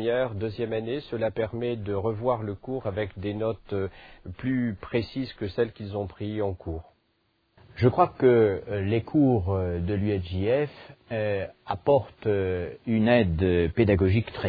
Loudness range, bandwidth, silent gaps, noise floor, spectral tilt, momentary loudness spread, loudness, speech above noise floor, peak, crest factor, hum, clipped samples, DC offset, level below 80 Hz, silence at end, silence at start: 6 LU; 5 kHz; none; -71 dBFS; -10.5 dB/octave; 11 LU; -27 LUFS; 45 dB; -6 dBFS; 20 dB; none; under 0.1%; under 0.1%; -48 dBFS; 0 s; 0 s